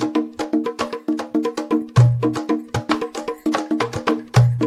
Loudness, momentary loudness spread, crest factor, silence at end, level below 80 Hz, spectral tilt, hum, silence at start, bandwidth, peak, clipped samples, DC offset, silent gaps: -21 LUFS; 9 LU; 16 dB; 0 s; -48 dBFS; -7 dB/octave; none; 0 s; 12 kHz; -4 dBFS; under 0.1%; under 0.1%; none